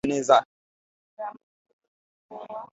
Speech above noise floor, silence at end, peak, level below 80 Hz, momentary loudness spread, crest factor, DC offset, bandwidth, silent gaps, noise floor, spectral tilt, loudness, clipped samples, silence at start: over 65 dB; 0.1 s; -2 dBFS; -64 dBFS; 23 LU; 26 dB; under 0.1%; 8.2 kHz; 0.45-1.17 s, 1.43-1.65 s, 1.73-1.79 s, 1.88-2.29 s; under -90 dBFS; -4 dB/octave; -21 LUFS; under 0.1%; 0.05 s